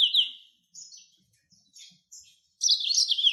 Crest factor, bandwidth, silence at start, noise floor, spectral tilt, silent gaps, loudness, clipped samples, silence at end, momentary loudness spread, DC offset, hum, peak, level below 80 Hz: 18 dB; 12.5 kHz; 0 s; -66 dBFS; 6.5 dB/octave; none; -23 LUFS; under 0.1%; 0 s; 25 LU; under 0.1%; none; -10 dBFS; under -90 dBFS